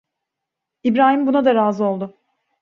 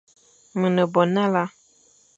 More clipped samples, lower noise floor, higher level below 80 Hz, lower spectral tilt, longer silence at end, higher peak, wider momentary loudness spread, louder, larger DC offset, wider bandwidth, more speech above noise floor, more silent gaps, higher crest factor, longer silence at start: neither; first, -82 dBFS vs -58 dBFS; first, -66 dBFS vs -72 dBFS; about the same, -7.5 dB/octave vs -7 dB/octave; second, 0.55 s vs 0.7 s; about the same, -2 dBFS vs -4 dBFS; about the same, 11 LU vs 11 LU; first, -17 LUFS vs -22 LUFS; neither; second, 6.6 kHz vs 7.8 kHz; first, 66 dB vs 38 dB; neither; about the same, 16 dB vs 20 dB; first, 0.85 s vs 0.55 s